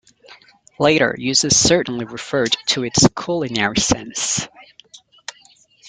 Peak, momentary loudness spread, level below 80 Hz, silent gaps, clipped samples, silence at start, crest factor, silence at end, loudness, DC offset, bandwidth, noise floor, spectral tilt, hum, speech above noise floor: 0 dBFS; 18 LU; -46 dBFS; none; under 0.1%; 0.3 s; 20 dB; 0 s; -17 LUFS; under 0.1%; 11 kHz; -52 dBFS; -3 dB/octave; none; 34 dB